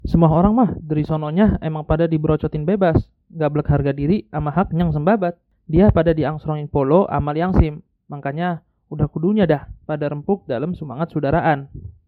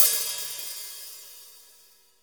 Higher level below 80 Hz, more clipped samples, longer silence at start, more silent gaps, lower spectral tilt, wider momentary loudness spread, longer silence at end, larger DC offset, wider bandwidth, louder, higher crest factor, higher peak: first, -32 dBFS vs -80 dBFS; neither; about the same, 0.05 s vs 0 s; neither; first, -11 dB/octave vs 3 dB/octave; second, 10 LU vs 22 LU; second, 0.15 s vs 0.6 s; neither; second, 4.7 kHz vs over 20 kHz; first, -19 LUFS vs -27 LUFS; second, 18 dB vs 30 dB; about the same, 0 dBFS vs 0 dBFS